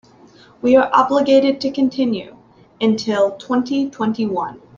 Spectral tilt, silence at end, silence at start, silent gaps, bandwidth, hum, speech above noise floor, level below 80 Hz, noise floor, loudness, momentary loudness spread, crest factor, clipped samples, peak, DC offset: -6 dB/octave; 0.2 s; 0.65 s; none; 7.4 kHz; none; 30 dB; -58 dBFS; -47 dBFS; -17 LUFS; 8 LU; 16 dB; under 0.1%; -2 dBFS; under 0.1%